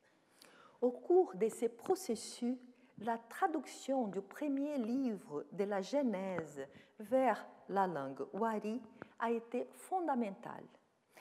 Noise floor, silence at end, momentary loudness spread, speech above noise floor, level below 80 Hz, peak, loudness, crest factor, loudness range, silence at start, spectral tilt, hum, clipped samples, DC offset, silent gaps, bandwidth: -66 dBFS; 0 s; 12 LU; 28 dB; under -90 dBFS; -20 dBFS; -38 LUFS; 18 dB; 2 LU; 0.8 s; -5.5 dB/octave; none; under 0.1%; under 0.1%; none; 15 kHz